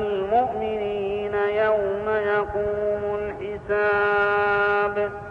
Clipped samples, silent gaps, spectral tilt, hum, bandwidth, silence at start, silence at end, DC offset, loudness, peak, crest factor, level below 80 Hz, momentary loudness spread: under 0.1%; none; -7 dB/octave; none; 5.4 kHz; 0 s; 0 s; under 0.1%; -23 LUFS; -10 dBFS; 12 dB; -48 dBFS; 7 LU